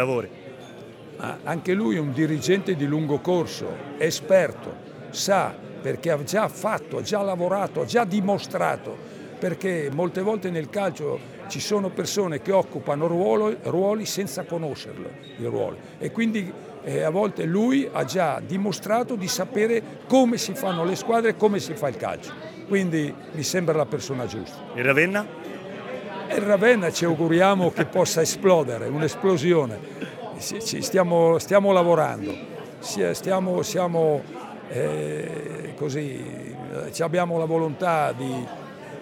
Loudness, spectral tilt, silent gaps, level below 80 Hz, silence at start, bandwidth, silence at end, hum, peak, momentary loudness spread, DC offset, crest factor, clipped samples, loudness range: -24 LUFS; -5 dB/octave; none; -66 dBFS; 0 s; 19.5 kHz; 0 s; none; -4 dBFS; 15 LU; under 0.1%; 20 dB; under 0.1%; 5 LU